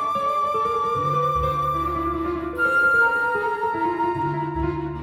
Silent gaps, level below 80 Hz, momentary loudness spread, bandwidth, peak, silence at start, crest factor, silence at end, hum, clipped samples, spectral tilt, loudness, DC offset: none; -40 dBFS; 8 LU; 18.5 kHz; -10 dBFS; 0 s; 12 dB; 0 s; none; under 0.1%; -6.5 dB/octave; -22 LUFS; under 0.1%